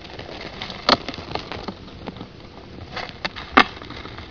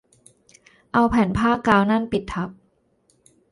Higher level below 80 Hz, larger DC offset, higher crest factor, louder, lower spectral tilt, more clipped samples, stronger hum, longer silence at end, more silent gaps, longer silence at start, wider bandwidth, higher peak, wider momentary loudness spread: about the same, -46 dBFS vs -44 dBFS; first, 0.2% vs under 0.1%; first, 26 dB vs 20 dB; second, -23 LUFS vs -20 LUFS; second, -4 dB/octave vs -7 dB/octave; neither; neither; second, 0 s vs 1 s; neither; second, 0 s vs 0.95 s; second, 5.4 kHz vs 11 kHz; first, 0 dBFS vs -4 dBFS; first, 22 LU vs 12 LU